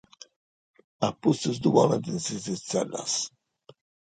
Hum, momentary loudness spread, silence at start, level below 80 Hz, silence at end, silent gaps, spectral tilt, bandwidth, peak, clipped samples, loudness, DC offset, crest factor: none; 9 LU; 1 s; -66 dBFS; 0.85 s; none; -5 dB/octave; 9.6 kHz; -6 dBFS; under 0.1%; -27 LUFS; under 0.1%; 22 dB